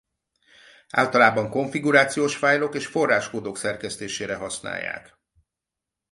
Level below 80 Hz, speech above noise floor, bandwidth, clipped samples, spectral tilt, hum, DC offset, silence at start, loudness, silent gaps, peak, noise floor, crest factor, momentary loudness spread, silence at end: -62 dBFS; 64 dB; 11.5 kHz; under 0.1%; -4 dB/octave; none; under 0.1%; 0.95 s; -23 LUFS; none; -2 dBFS; -87 dBFS; 22 dB; 12 LU; 1.1 s